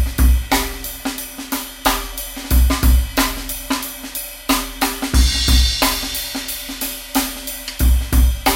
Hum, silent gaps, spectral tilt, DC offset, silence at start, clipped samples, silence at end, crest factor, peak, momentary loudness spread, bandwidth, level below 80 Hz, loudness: none; none; -3.5 dB/octave; under 0.1%; 0 s; under 0.1%; 0 s; 16 dB; -2 dBFS; 10 LU; 17 kHz; -20 dBFS; -19 LUFS